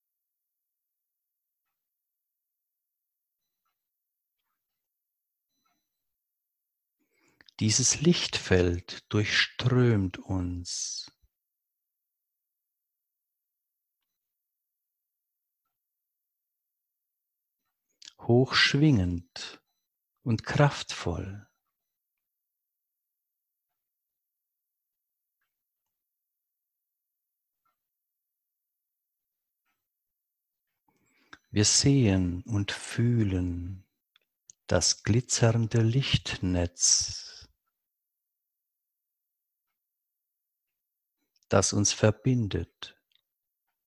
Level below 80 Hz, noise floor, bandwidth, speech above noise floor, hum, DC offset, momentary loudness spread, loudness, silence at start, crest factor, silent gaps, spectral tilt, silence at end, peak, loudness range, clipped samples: -50 dBFS; -86 dBFS; 12 kHz; 59 dB; none; under 0.1%; 16 LU; -26 LUFS; 7.6 s; 24 dB; none; -4 dB/octave; 0.95 s; -8 dBFS; 9 LU; under 0.1%